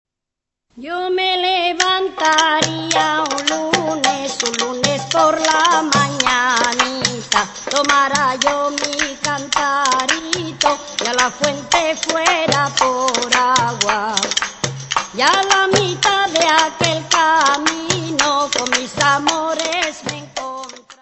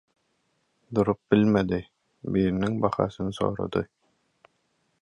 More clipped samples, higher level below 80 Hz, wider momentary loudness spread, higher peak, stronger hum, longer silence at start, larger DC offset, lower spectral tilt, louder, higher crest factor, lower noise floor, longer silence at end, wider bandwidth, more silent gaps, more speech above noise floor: neither; about the same, -52 dBFS vs -52 dBFS; about the same, 7 LU vs 9 LU; first, 0 dBFS vs -6 dBFS; neither; second, 0.75 s vs 0.9 s; neither; second, -2 dB/octave vs -8 dB/octave; first, -16 LUFS vs -26 LUFS; about the same, 18 dB vs 22 dB; first, -82 dBFS vs -72 dBFS; second, 0.1 s vs 1.15 s; second, 8.4 kHz vs 10.5 kHz; neither; first, 66 dB vs 48 dB